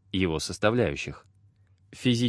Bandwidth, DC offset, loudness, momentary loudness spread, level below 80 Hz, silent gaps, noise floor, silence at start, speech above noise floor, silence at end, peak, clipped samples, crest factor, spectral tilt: 11 kHz; under 0.1%; -28 LUFS; 12 LU; -50 dBFS; none; -61 dBFS; 0.15 s; 35 dB; 0 s; -8 dBFS; under 0.1%; 20 dB; -5.5 dB/octave